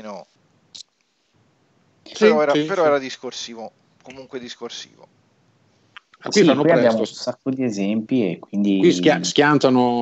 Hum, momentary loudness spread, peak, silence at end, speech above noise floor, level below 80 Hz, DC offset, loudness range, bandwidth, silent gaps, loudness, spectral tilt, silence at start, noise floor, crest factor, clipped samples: none; 22 LU; 0 dBFS; 0 s; 48 dB; -68 dBFS; under 0.1%; 8 LU; 8.2 kHz; none; -18 LUFS; -5 dB/octave; 0.05 s; -67 dBFS; 20 dB; under 0.1%